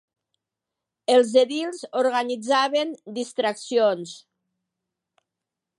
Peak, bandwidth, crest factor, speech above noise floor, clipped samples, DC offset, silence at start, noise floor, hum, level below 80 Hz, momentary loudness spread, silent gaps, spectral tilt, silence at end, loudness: -6 dBFS; 11.5 kHz; 18 dB; 64 dB; under 0.1%; under 0.1%; 1.1 s; -86 dBFS; none; -82 dBFS; 12 LU; none; -3 dB/octave; 1.6 s; -23 LUFS